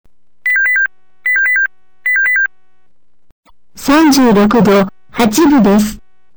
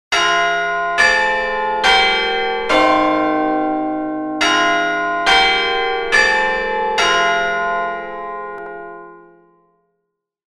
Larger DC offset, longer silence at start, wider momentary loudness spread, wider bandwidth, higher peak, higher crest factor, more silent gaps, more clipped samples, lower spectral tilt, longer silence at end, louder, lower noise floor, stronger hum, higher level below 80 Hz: first, 1% vs under 0.1%; first, 0.45 s vs 0.1 s; second, 11 LU vs 14 LU; first, over 20 kHz vs 13 kHz; second, -4 dBFS vs 0 dBFS; second, 8 dB vs 16 dB; first, 3.32-3.43 s vs none; neither; first, -5 dB/octave vs -2 dB/octave; second, 0.4 s vs 1.4 s; first, -11 LUFS vs -15 LUFS; second, -65 dBFS vs -75 dBFS; neither; about the same, -40 dBFS vs -44 dBFS